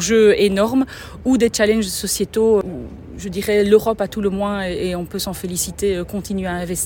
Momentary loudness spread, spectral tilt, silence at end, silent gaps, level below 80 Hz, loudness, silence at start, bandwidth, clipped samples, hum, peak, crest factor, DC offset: 11 LU; -4.5 dB/octave; 0 s; none; -40 dBFS; -18 LUFS; 0 s; 17 kHz; under 0.1%; none; -2 dBFS; 18 dB; under 0.1%